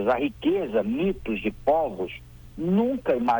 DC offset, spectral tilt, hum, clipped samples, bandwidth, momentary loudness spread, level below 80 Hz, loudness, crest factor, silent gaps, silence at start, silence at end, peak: under 0.1%; -8 dB/octave; none; under 0.1%; over 20 kHz; 10 LU; -48 dBFS; -26 LUFS; 12 dB; none; 0 s; 0 s; -12 dBFS